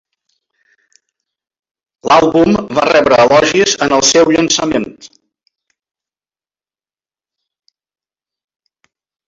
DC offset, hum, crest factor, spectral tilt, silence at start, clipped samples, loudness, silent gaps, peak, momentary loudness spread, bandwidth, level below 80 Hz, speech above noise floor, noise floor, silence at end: under 0.1%; none; 16 dB; -3 dB/octave; 2.05 s; under 0.1%; -10 LUFS; none; 0 dBFS; 8 LU; 7.8 kHz; -48 dBFS; over 80 dB; under -90 dBFS; 4.2 s